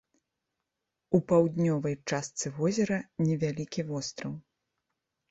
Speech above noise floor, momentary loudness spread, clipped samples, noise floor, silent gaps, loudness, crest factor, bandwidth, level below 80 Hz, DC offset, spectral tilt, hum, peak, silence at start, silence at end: 57 dB; 11 LU; under 0.1%; -86 dBFS; none; -30 LUFS; 22 dB; 8.2 kHz; -66 dBFS; under 0.1%; -6 dB/octave; none; -10 dBFS; 1.1 s; 0.9 s